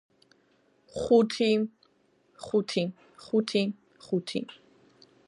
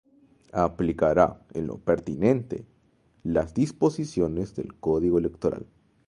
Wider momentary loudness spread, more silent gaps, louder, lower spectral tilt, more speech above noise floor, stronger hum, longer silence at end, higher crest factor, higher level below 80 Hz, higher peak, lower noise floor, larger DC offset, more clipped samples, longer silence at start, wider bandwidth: first, 20 LU vs 11 LU; neither; about the same, -28 LUFS vs -26 LUFS; second, -5.5 dB/octave vs -8 dB/octave; about the same, 40 dB vs 38 dB; neither; first, 0.75 s vs 0.45 s; about the same, 20 dB vs 22 dB; second, -66 dBFS vs -48 dBFS; second, -10 dBFS vs -4 dBFS; about the same, -67 dBFS vs -64 dBFS; neither; neither; first, 0.95 s vs 0.55 s; about the same, 11.5 kHz vs 11 kHz